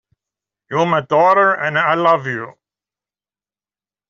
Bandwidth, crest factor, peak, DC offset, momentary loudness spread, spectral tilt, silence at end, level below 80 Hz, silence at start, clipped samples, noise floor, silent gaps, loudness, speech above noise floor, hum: 7.4 kHz; 16 dB; -2 dBFS; under 0.1%; 13 LU; -6 dB/octave; 1.6 s; -64 dBFS; 0.7 s; under 0.1%; under -90 dBFS; none; -15 LUFS; over 75 dB; none